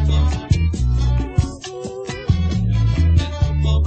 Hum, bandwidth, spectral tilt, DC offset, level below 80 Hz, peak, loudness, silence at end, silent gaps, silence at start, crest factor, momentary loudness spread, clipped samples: none; 8.6 kHz; -7 dB/octave; under 0.1%; -20 dBFS; -2 dBFS; -19 LUFS; 0 s; none; 0 s; 14 dB; 11 LU; under 0.1%